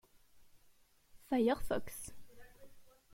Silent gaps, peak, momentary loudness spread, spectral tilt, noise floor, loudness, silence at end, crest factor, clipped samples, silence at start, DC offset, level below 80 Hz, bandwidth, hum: none; -22 dBFS; 15 LU; -5 dB/octave; -67 dBFS; -37 LUFS; 0.25 s; 18 dB; under 0.1%; 0.35 s; under 0.1%; -58 dBFS; 16.5 kHz; none